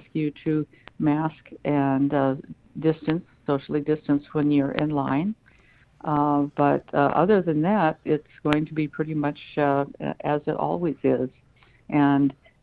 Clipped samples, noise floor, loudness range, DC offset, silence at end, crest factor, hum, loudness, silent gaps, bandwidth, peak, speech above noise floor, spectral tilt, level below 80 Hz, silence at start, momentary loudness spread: under 0.1%; -57 dBFS; 3 LU; under 0.1%; 0.3 s; 24 dB; none; -24 LUFS; none; 4.7 kHz; 0 dBFS; 33 dB; -9.5 dB/octave; -58 dBFS; 0.15 s; 8 LU